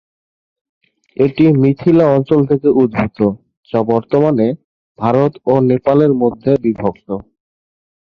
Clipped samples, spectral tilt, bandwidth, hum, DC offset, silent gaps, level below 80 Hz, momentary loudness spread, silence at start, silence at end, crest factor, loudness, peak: under 0.1%; -10.5 dB/octave; 6.2 kHz; none; under 0.1%; 3.57-3.63 s, 4.64-4.95 s; -48 dBFS; 9 LU; 1.2 s; 0.9 s; 14 dB; -14 LUFS; -2 dBFS